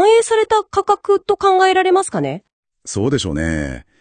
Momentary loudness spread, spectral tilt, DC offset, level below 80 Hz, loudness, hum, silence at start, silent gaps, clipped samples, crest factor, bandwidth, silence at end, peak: 13 LU; -4.5 dB/octave; under 0.1%; -40 dBFS; -16 LUFS; none; 0 s; 2.53-2.63 s; under 0.1%; 14 dB; 10 kHz; 0.2 s; -2 dBFS